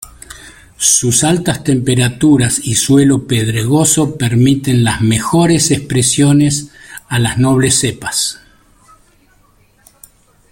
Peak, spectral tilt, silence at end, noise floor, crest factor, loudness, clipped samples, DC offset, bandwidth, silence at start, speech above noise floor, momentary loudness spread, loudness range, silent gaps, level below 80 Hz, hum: 0 dBFS; -4.5 dB/octave; 2.2 s; -51 dBFS; 14 dB; -12 LUFS; under 0.1%; under 0.1%; 17 kHz; 0.35 s; 39 dB; 6 LU; 5 LU; none; -40 dBFS; none